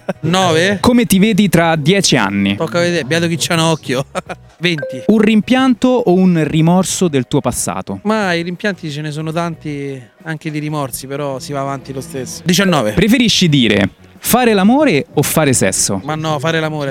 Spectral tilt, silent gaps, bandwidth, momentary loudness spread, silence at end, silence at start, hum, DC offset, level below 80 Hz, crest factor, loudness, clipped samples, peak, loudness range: -4.5 dB/octave; none; 17.5 kHz; 11 LU; 0 s; 0.1 s; none; under 0.1%; -44 dBFS; 14 dB; -14 LUFS; under 0.1%; 0 dBFS; 8 LU